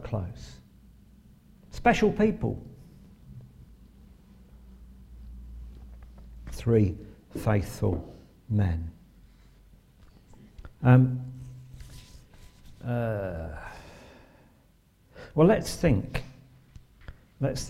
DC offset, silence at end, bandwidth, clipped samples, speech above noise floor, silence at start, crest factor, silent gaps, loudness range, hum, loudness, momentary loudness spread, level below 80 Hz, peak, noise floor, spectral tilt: under 0.1%; 0 s; 14 kHz; under 0.1%; 36 dB; 0 s; 24 dB; none; 11 LU; none; -27 LUFS; 27 LU; -46 dBFS; -6 dBFS; -61 dBFS; -7.5 dB/octave